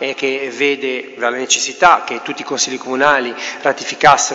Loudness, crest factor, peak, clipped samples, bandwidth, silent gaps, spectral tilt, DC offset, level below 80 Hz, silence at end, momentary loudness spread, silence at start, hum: -15 LUFS; 16 dB; 0 dBFS; 0.2%; 8.8 kHz; none; -1.5 dB/octave; under 0.1%; -54 dBFS; 0 s; 11 LU; 0 s; none